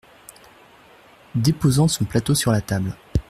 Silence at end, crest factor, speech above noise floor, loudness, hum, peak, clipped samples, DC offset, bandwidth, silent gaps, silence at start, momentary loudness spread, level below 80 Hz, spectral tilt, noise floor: 0.1 s; 16 dB; 30 dB; -21 LUFS; none; -6 dBFS; under 0.1%; under 0.1%; 15 kHz; none; 1.35 s; 8 LU; -40 dBFS; -5.5 dB/octave; -50 dBFS